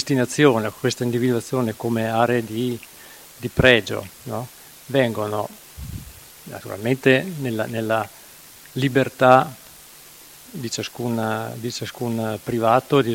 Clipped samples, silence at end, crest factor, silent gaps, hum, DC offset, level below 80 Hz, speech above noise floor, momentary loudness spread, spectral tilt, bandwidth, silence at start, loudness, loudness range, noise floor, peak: under 0.1%; 0 s; 22 dB; none; none; under 0.1%; -50 dBFS; 24 dB; 24 LU; -5.5 dB/octave; 17 kHz; 0 s; -21 LUFS; 4 LU; -45 dBFS; 0 dBFS